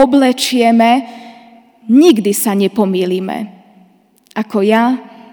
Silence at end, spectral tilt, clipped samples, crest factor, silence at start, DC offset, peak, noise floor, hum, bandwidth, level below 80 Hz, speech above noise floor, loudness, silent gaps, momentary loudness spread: 0.3 s; -4.5 dB/octave; 0.3%; 14 dB; 0 s; under 0.1%; 0 dBFS; -50 dBFS; none; over 20 kHz; -58 dBFS; 38 dB; -12 LUFS; none; 15 LU